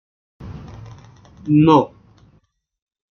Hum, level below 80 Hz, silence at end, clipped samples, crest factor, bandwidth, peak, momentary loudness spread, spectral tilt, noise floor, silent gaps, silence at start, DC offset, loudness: none; -50 dBFS; 1.3 s; under 0.1%; 18 dB; 6.6 kHz; -2 dBFS; 25 LU; -9 dB/octave; -60 dBFS; none; 0.4 s; under 0.1%; -15 LUFS